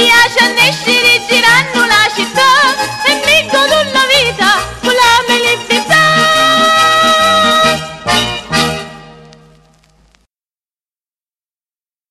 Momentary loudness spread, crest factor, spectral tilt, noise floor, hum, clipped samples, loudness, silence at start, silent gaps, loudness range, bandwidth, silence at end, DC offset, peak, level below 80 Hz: 6 LU; 12 dB; -2 dB/octave; under -90 dBFS; none; under 0.1%; -8 LUFS; 0 s; none; 10 LU; 16 kHz; 2.95 s; under 0.1%; 0 dBFS; -42 dBFS